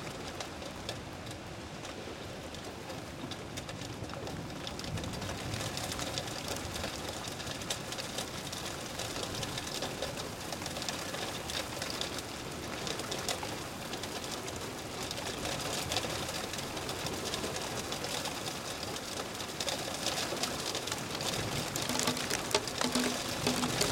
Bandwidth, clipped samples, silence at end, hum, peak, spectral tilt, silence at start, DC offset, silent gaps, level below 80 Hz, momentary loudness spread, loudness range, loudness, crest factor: 17 kHz; under 0.1%; 0 s; none; -12 dBFS; -3 dB/octave; 0 s; under 0.1%; none; -56 dBFS; 10 LU; 8 LU; -36 LUFS; 26 dB